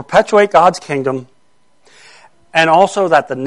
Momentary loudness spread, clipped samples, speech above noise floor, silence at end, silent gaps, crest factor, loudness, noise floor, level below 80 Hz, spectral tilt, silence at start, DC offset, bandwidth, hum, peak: 9 LU; under 0.1%; 48 dB; 0 s; none; 14 dB; -12 LUFS; -60 dBFS; -52 dBFS; -4.5 dB/octave; 0 s; 0.3%; 11.5 kHz; none; 0 dBFS